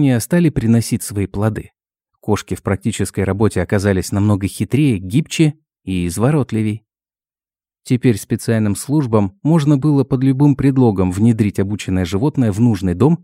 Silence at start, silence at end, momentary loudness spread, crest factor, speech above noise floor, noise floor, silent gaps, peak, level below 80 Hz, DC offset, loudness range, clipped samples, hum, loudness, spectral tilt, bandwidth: 0 s; 0.1 s; 7 LU; 16 dB; over 75 dB; under -90 dBFS; none; 0 dBFS; -42 dBFS; under 0.1%; 4 LU; under 0.1%; none; -16 LUFS; -7 dB/octave; 16 kHz